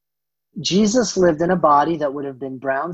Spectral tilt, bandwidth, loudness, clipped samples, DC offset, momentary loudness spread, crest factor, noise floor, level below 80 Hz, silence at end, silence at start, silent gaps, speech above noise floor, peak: -5 dB/octave; 8.4 kHz; -18 LUFS; under 0.1%; under 0.1%; 13 LU; 16 dB; -85 dBFS; -52 dBFS; 0 s; 0.55 s; none; 67 dB; -4 dBFS